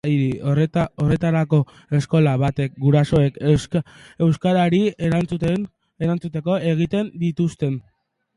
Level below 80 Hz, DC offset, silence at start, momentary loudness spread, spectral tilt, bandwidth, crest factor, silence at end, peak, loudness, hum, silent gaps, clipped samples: -46 dBFS; under 0.1%; 0.05 s; 8 LU; -8 dB/octave; 11 kHz; 14 dB; 0.55 s; -4 dBFS; -20 LUFS; none; none; under 0.1%